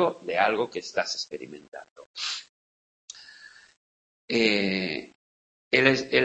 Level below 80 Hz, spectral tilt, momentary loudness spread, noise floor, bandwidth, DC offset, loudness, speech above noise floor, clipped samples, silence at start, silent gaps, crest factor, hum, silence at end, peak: -66 dBFS; -4 dB/octave; 24 LU; -51 dBFS; 8.6 kHz; under 0.1%; -26 LUFS; 25 dB; under 0.1%; 0 s; 1.68-1.72 s, 1.91-1.96 s, 2.06-2.14 s, 2.49-3.08 s, 3.77-4.28 s, 5.15-5.71 s; 26 dB; none; 0 s; -2 dBFS